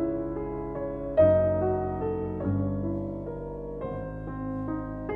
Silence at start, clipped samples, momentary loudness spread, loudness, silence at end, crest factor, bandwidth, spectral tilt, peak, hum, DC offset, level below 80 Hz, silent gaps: 0 s; under 0.1%; 14 LU; -29 LUFS; 0 s; 18 dB; 3.7 kHz; -11.5 dB/octave; -10 dBFS; none; under 0.1%; -44 dBFS; none